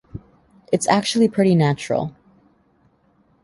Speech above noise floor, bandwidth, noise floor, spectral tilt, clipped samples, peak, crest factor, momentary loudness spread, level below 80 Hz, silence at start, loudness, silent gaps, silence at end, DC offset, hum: 42 dB; 11.5 kHz; -60 dBFS; -5.5 dB/octave; under 0.1%; -2 dBFS; 20 dB; 17 LU; -54 dBFS; 0.15 s; -19 LUFS; none; 1.35 s; under 0.1%; none